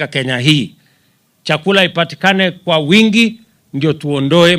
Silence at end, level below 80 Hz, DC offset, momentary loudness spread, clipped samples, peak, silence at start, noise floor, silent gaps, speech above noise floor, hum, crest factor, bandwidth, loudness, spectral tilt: 0 s; -56 dBFS; under 0.1%; 9 LU; under 0.1%; 0 dBFS; 0 s; -57 dBFS; none; 44 dB; none; 14 dB; 16 kHz; -13 LUFS; -5 dB/octave